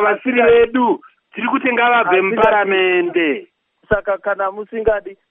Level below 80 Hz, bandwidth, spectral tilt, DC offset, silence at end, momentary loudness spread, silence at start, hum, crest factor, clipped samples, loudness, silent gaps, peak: -44 dBFS; 3.8 kHz; -2.5 dB/octave; under 0.1%; 0.2 s; 10 LU; 0 s; none; 16 dB; under 0.1%; -16 LUFS; none; 0 dBFS